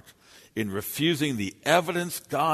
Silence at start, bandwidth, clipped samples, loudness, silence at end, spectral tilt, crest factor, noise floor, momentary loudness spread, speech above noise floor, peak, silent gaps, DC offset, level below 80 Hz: 0.35 s; 13.5 kHz; under 0.1%; -27 LUFS; 0 s; -4.5 dB/octave; 22 dB; -54 dBFS; 8 LU; 28 dB; -6 dBFS; none; under 0.1%; -64 dBFS